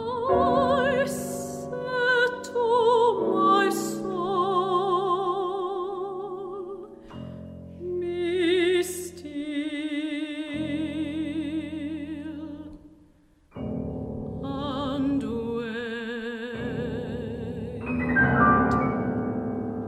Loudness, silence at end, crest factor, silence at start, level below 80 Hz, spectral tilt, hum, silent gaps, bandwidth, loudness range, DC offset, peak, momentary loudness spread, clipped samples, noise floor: -26 LUFS; 0 s; 20 dB; 0 s; -50 dBFS; -5.5 dB/octave; none; none; 16 kHz; 10 LU; under 0.1%; -8 dBFS; 15 LU; under 0.1%; -58 dBFS